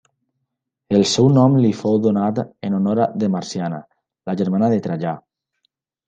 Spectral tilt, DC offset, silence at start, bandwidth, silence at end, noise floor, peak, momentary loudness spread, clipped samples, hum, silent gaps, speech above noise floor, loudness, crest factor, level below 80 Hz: -6.5 dB/octave; under 0.1%; 0.9 s; 9.2 kHz; 0.9 s; -78 dBFS; -2 dBFS; 13 LU; under 0.1%; none; none; 60 dB; -18 LUFS; 16 dB; -60 dBFS